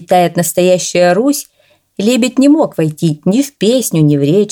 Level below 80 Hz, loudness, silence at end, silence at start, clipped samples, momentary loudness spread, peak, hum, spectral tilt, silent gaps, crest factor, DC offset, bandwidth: -58 dBFS; -12 LUFS; 0 s; 0 s; under 0.1%; 5 LU; 0 dBFS; none; -5.5 dB/octave; none; 12 dB; under 0.1%; 19 kHz